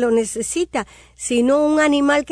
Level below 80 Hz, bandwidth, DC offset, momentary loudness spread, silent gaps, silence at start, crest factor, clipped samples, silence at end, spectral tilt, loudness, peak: -50 dBFS; 11 kHz; under 0.1%; 12 LU; none; 0 s; 12 dB; under 0.1%; 0 s; -3 dB/octave; -18 LUFS; -6 dBFS